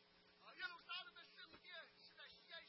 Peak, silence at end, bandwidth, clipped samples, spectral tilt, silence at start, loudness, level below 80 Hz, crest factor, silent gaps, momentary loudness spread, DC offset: -38 dBFS; 0 s; 5.6 kHz; under 0.1%; 2 dB/octave; 0 s; -55 LUFS; under -90 dBFS; 22 dB; none; 11 LU; under 0.1%